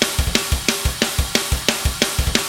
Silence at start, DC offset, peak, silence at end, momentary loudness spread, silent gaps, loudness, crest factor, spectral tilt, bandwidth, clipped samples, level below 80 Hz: 0 s; under 0.1%; 0 dBFS; 0 s; 2 LU; none; -19 LUFS; 20 dB; -3 dB/octave; over 20 kHz; under 0.1%; -26 dBFS